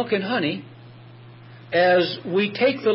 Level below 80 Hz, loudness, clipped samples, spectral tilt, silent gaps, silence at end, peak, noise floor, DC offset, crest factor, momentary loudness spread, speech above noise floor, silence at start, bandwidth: -70 dBFS; -21 LUFS; under 0.1%; -9.5 dB/octave; none; 0 s; -8 dBFS; -44 dBFS; under 0.1%; 14 dB; 8 LU; 23 dB; 0 s; 5.8 kHz